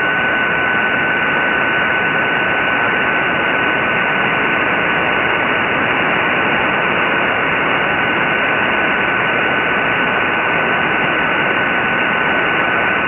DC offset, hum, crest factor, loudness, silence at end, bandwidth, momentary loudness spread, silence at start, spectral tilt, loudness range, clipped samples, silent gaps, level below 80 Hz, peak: under 0.1%; none; 14 dB; -14 LUFS; 0 s; 6.6 kHz; 0 LU; 0 s; -7 dB/octave; 0 LU; under 0.1%; none; -46 dBFS; -2 dBFS